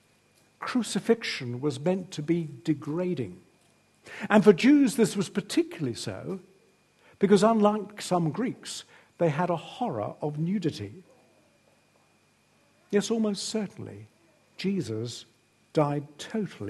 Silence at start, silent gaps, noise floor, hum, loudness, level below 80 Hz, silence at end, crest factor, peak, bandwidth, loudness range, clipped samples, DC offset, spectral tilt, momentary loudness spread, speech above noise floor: 0.6 s; none; -65 dBFS; 50 Hz at -60 dBFS; -27 LUFS; -72 dBFS; 0 s; 24 dB; -4 dBFS; 12.5 kHz; 8 LU; under 0.1%; under 0.1%; -6 dB/octave; 17 LU; 38 dB